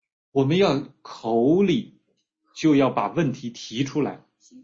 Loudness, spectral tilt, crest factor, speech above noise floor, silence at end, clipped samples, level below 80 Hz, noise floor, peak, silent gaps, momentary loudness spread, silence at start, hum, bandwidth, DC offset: -23 LUFS; -6.5 dB/octave; 16 dB; 50 dB; 0.05 s; under 0.1%; -60 dBFS; -72 dBFS; -8 dBFS; none; 13 LU; 0.35 s; none; 7.6 kHz; under 0.1%